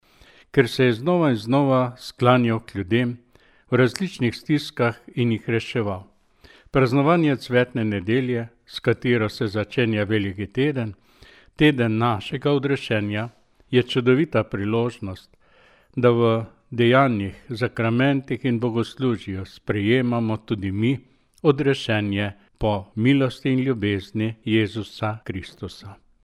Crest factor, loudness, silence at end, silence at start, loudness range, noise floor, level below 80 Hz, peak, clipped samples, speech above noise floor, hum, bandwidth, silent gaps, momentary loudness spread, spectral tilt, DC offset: 20 dB; -22 LUFS; 0.3 s; 0.55 s; 3 LU; -55 dBFS; -52 dBFS; -2 dBFS; under 0.1%; 34 dB; none; 12.5 kHz; none; 11 LU; -7 dB/octave; under 0.1%